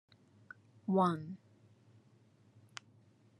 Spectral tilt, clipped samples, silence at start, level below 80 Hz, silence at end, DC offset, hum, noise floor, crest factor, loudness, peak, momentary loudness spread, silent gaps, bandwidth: -7.5 dB/octave; under 0.1%; 0.85 s; -86 dBFS; 2.05 s; under 0.1%; none; -67 dBFS; 22 dB; -35 LUFS; -18 dBFS; 26 LU; none; 10.5 kHz